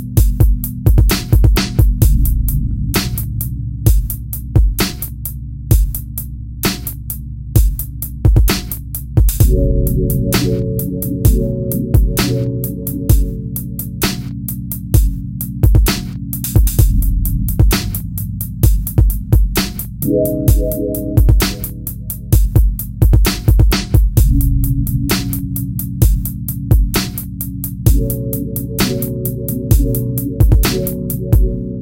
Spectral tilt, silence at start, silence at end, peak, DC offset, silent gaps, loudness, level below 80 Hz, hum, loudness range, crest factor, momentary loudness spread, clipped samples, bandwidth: -5.5 dB/octave; 0 s; 0 s; 0 dBFS; under 0.1%; none; -16 LUFS; -16 dBFS; none; 3 LU; 14 dB; 10 LU; under 0.1%; 17.5 kHz